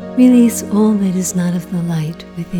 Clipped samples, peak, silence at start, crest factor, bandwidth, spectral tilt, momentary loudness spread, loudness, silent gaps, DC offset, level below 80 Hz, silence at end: under 0.1%; -2 dBFS; 0 s; 12 dB; 18 kHz; -6.5 dB/octave; 12 LU; -14 LUFS; none; under 0.1%; -48 dBFS; 0 s